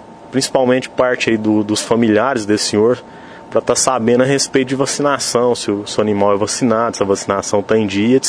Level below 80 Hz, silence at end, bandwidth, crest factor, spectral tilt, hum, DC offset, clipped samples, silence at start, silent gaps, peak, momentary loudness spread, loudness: -52 dBFS; 0 s; 11 kHz; 16 dB; -4 dB/octave; none; under 0.1%; under 0.1%; 0 s; none; 0 dBFS; 4 LU; -15 LUFS